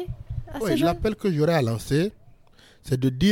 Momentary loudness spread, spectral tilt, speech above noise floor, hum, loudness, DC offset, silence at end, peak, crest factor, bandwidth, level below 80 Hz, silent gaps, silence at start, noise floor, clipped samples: 11 LU; -6.5 dB/octave; 31 dB; none; -24 LUFS; under 0.1%; 0 s; -10 dBFS; 14 dB; 17 kHz; -42 dBFS; none; 0 s; -53 dBFS; under 0.1%